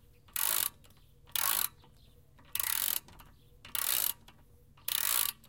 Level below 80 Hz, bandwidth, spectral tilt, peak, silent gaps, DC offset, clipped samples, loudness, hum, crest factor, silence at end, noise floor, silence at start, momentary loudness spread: -64 dBFS; 17.5 kHz; 1.5 dB/octave; -10 dBFS; none; under 0.1%; under 0.1%; -31 LUFS; none; 26 dB; 0.15 s; -61 dBFS; 0.35 s; 9 LU